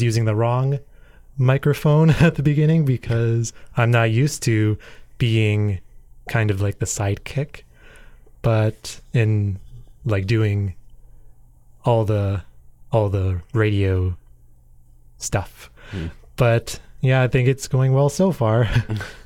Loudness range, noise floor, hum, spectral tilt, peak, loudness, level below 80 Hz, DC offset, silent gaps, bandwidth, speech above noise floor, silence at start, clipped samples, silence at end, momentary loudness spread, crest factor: 6 LU; -48 dBFS; none; -6.5 dB/octave; -2 dBFS; -20 LUFS; -42 dBFS; under 0.1%; none; 15.5 kHz; 29 dB; 0 s; under 0.1%; 0.05 s; 13 LU; 18 dB